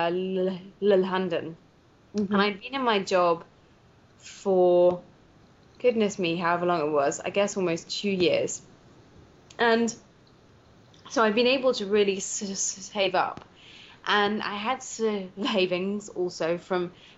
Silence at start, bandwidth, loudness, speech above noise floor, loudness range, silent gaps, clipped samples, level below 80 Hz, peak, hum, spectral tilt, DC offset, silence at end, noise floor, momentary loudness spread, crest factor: 0 s; 8 kHz; -26 LUFS; 32 dB; 3 LU; none; under 0.1%; -66 dBFS; -8 dBFS; none; -3 dB/octave; under 0.1%; 0.25 s; -58 dBFS; 9 LU; 18 dB